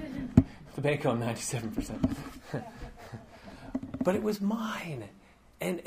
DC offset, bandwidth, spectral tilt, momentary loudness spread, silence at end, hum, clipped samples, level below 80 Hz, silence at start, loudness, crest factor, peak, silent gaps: under 0.1%; 15.5 kHz; -6 dB/octave; 21 LU; 0 s; none; under 0.1%; -48 dBFS; 0 s; -32 LUFS; 28 dB; -4 dBFS; none